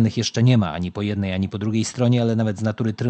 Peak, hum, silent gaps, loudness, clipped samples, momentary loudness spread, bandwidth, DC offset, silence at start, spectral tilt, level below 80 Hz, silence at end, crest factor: -4 dBFS; none; none; -21 LUFS; under 0.1%; 7 LU; 8.8 kHz; under 0.1%; 0 s; -6.5 dB/octave; -44 dBFS; 0 s; 16 dB